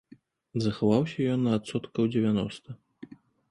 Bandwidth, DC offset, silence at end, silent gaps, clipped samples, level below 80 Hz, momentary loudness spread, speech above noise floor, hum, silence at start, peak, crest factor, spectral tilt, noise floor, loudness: 11 kHz; under 0.1%; 0.45 s; none; under 0.1%; -60 dBFS; 22 LU; 30 dB; none; 0.55 s; -10 dBFS; 18 dB; -7.5 dB/octave; -57 dBFS; -28 LUFS